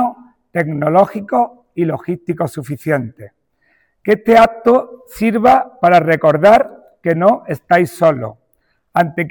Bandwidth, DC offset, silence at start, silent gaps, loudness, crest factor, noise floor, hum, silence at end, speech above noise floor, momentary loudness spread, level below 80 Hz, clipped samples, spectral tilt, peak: 19.5 kHz; under 0.1%; 0 s; none; -14 LUFS; 14 dB; -63 dBFS; none; 0 s; 50 dB; 13 LU; -50 dBFS; under 0.1%; -7 dB/octave; -2 dBFS